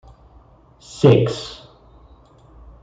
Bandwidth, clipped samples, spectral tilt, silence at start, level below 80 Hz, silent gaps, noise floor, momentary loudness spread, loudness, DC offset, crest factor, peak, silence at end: 9 kHz; under 0.1%; -7 dB/octave; 0.95 s; -48 dBFS; none; -49 dBFS; 26 LU; -17 LUFS; under 0.1%; 20 dB; -2 dBFS; 1.3 s